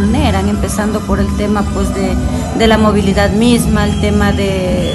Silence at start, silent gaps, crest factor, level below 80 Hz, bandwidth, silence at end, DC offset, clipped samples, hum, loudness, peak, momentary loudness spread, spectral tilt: 0 s; none; 12 dB; -22 dBFS; 13 kHz; 0 s; under 0.1%; under 0.1%; none; -13 LUFS; 0 dBFS; 5 LU; -6 dB/octave